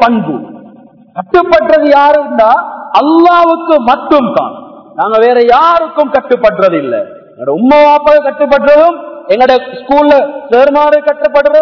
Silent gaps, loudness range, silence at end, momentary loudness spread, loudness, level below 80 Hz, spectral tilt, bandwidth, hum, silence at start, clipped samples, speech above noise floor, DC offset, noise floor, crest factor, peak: none; 2 LU; 0 s; 11 LU; -8 LUFS; -44 dBFS; -6.5 dB/octave; 5.4 kHz; none; 0 s; 5%; 29 dB; 0.3%; -37 dBFS; 8 dB; 0 dBFS